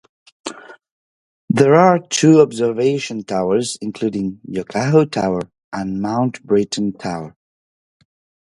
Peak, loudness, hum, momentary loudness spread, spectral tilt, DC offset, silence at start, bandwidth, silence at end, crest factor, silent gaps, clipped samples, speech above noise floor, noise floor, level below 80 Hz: 0 dBFS; -17 LUFS; none; 16 LU; -5.5 dB/octave; under 0.1%; 0.45 s; 11.5 kHz; 1.15 s; 18 dB; 0.91-1.48 s, 5.64-5.72 s; under 0.1%; over 74 dB; under -90 dBFS; -56 dBFS